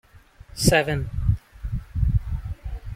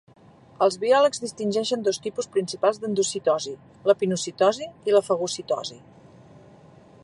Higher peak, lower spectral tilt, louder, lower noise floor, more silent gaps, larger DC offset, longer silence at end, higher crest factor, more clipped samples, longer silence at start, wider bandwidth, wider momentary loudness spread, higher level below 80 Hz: about the same, -4 dBFS vs -4 dBFS; about the same, -5 dB/octave vs -4 dB/octave; about the same, -25 LUFS vs -24 LUFS; about the same, -48 dBFS vs -50 dBFS; neither; neither; second, 0 s vs 0.65 s; about the same, 22 dB vs 20 dB; neither; second, 0.15 s vs 0.6 s; first, 16.5 kHz vs 11.5 kHz; first, 15 LU vs 9 LU; first, -30 dBFS vs -68 dBFS